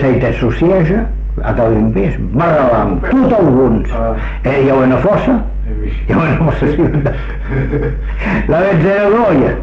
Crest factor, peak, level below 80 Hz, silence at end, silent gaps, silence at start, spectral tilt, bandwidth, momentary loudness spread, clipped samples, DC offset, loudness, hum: 10 dB; -2 dBFS; -20 dBFS; 0 s; none; 0 s; -9.5 dB/octave; 6.6 kHz; 9 LU; under 0.1%; under 0.1%; -13 LUFS; none